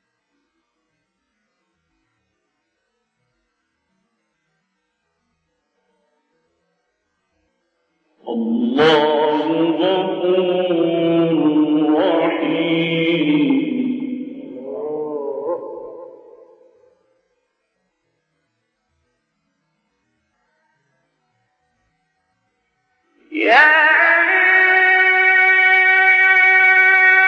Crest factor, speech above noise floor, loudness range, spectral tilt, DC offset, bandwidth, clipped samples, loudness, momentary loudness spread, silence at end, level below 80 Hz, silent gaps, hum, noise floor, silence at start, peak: 18 dB; 56 dB; 19 LU; -6 dB/octave; under 0.1%; 7.2 kHz; under 0.1%; -14 LUFS; 17 LU; 0 s; -70 dBFS; none; none; -72 dBFS; 8.25 s; 0 dBFS